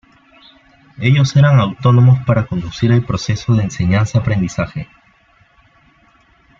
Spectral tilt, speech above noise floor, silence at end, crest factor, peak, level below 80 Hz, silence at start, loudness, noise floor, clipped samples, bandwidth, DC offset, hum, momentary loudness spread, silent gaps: -7 dB/octave; 39 dB; 1.75 s; 14 dB; 0 dBFS; -42 dBFS; 1 s; -14 LUFS; -52 dBFS; under 0.1%; 7.4 kHz; under 0.1%; none; 11 LU; none